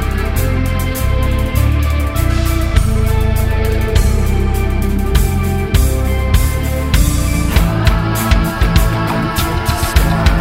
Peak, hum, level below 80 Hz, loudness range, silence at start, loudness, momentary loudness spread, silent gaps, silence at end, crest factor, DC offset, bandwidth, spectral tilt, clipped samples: 0 dBFS; none; -16 dBFS; 1 LU; 0 s; -15 LUFS; 3 LU; none; 0 s; 12 dB; under 0.1%; 16.5 kHz; -5.5 dB/octave; under 0.1%